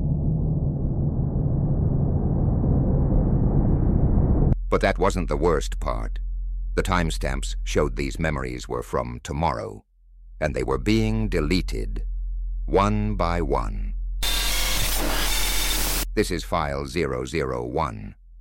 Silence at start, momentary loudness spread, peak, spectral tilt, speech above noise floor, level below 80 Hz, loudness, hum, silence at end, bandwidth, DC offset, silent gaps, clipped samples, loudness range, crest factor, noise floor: 0 s; 9 LU; -6 dBFS; -5 dB/octave; 23 dB; -28 dBFS; -24 LUFS; none; 0 s; 17 kHz; under 0.1%; none; under 0.1%; 5 LU; 16 dB; -46 dBFS